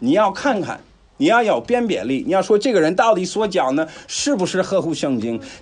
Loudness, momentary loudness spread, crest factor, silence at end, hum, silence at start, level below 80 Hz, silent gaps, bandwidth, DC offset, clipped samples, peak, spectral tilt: -18 LUFS; 8 LU; 16 dB; 0.05 s; none; 0 s; -54 dBFS; none; 10.5 kHz; under 0.1%; under 0.1%; -2 dBFS; -4.5 dB/octave